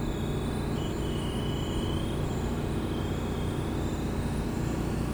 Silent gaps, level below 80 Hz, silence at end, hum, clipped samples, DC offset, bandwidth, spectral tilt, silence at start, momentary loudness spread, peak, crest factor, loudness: none; -38 dBFS; 0 s; none; under 0.1%; under 0.1%; over 20 kHz; -6.5 dB/octave; 0 s; 1 LU; -18 dBFS; 12 dB; -31 LUFS